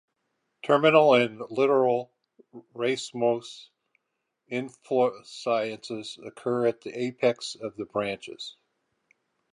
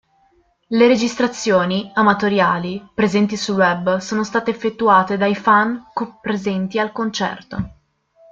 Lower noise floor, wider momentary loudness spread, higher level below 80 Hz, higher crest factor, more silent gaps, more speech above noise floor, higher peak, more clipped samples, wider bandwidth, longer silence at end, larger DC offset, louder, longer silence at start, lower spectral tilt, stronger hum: first, -81 dBFS vs -59 dBFS; first, 19 LU vs 11 LU; second, -76 dBFS vs -52 dBFS; first, 22 dB vs 16 dB; neither; first, 55 dB vs 41 dB; about the same, -4 dBFS vs -2 dBFS; neither; first, 11 kHz vs 7.8 kHz; first, 1.05 s vs 0.6 s; neither; second, -26 LUFS vs -18 LUFS; about the same, 0.65 s vs 0.7 s; about the same, -5 dB/octave vs -5 dB/octave; neither